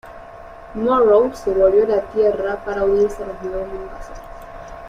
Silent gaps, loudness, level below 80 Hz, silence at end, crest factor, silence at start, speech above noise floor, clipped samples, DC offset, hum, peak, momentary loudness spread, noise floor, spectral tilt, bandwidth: none; -18 LUFS; -40 dBFS; 0 s; 16 dB; 0.05 s; 20 dB; under 0.1%; under 0.1%; none; -2 dBFS; 22 LU; -38 dBFS; -6.5 dB/octave; 11 kHz